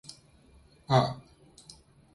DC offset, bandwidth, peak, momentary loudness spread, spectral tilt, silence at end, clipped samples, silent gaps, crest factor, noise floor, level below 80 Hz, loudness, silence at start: under 0.1%; 11.5 kHz; -10 dBFS; 26 LU; -6.5 dB/octave; 0.95 s; under 0.1%; none; 24 dB; -59 dBFS; -60 dBFS; -28 LUFS; 0.9 s